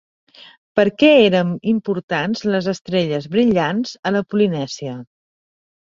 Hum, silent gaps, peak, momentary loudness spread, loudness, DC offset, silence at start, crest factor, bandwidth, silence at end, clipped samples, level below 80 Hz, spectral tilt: none; 2.03-2.08 s, 2.81-2.85 s, 3.99-4.03 s; -2 dBFS; 12 LU; -18 LUFS; under 0.1%; 0.75 s; 18 dB; 7.6 kHz; 0.9 s; under 0.1%; -58 dBFS; -6 dB/octave